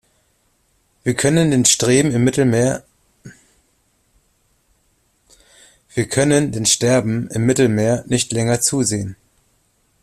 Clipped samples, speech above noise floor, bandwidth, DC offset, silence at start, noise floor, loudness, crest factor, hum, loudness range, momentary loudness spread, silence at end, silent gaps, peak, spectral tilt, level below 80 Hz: under 0.1%; 46 dB; 14.5 kHz; under 0.1%; 1.05 s; -62 dBFS; -16 LUFS; 20 dB; none; 8 LU; 10 LU; 0.9 s; none; 0 dBFS; -4.5 dB/octave; -50 dBFS